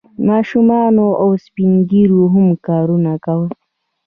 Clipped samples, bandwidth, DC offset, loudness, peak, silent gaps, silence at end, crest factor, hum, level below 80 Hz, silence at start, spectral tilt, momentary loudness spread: under 0.1%; 4.9 kHz; under 0.1%; -13 LUFS; -2 dBFS; none; 0.55 s; 10 dB; none; -54 dBFS; 0.2 s; -11 dB/octave; 7 LU